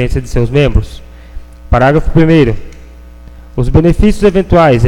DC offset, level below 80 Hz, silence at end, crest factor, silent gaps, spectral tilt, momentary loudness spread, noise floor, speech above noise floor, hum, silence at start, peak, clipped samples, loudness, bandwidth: under 0.1%; -18 dBFS; 0 s; 10 dB; none; -8 dB/octave; 10 LU; -32 dBFS; 24 dB; none; 0 s; 0 dBFS; 0.3%; -10 LUFS; 12 kHz